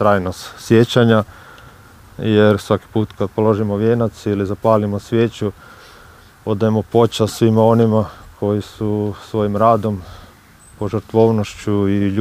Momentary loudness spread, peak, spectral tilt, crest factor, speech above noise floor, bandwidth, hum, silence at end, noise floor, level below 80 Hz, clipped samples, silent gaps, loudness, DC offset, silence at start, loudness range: 11 LU; 0 dBFS; -7 dB/octave; 16 dB; 29 dB; 15.5 kHz; none; 0 s; -45 dBFS; -48 dBFS; under 0.1%; none; -17 LUFS; under 0.1%; 0 s; 3 LU